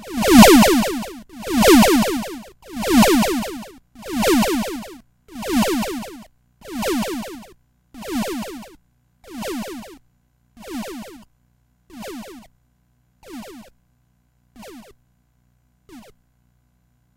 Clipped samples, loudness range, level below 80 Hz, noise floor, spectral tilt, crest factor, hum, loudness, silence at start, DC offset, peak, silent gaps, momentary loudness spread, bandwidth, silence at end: under 0.1%; 23 LU; -40 dBFS; -63 dBFS; -4 dB/octave; 20 dB; 60 Hz at -45 dBFS; -17 LUFS; 0 s; under 0.1%; 0 dBFS; none; 27 LU; 16 kHz; 1.15 s